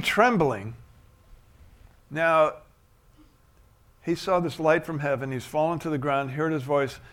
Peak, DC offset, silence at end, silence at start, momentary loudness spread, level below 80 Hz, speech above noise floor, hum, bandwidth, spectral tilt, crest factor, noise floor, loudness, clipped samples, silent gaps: -4 dBFS; under 0.1%; 0.05 s; 0 s; 12 LU; -56 dBFS; 34 dB; none; 17.5 kHz; -6 dB/octave; 22 dB; -58 dBFS; -25 LUFS; under 0.1%; none